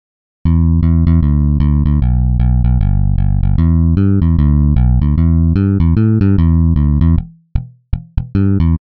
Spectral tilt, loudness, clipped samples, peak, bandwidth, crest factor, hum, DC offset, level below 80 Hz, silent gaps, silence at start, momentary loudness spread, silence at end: -11 dB/octave; -13 LUFS; under 0.1%; 0 dBFS; 4.3 kHz; 12 dB; none; 0.7%; -16 dBFS; none; 0.45 s; 8 LU; 0.2 s